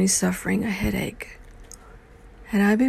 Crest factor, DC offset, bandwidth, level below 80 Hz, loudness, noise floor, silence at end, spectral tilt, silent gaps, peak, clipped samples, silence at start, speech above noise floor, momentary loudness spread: 16 dB; under 0.1%; 14.5 kHz; -42 dBFS; -24 LUFS; -47 dBFS; 0 s; -4.5 dB/octave; none; -8 dBFS; under 0.1%; 0 s; 25 dB; 24 LU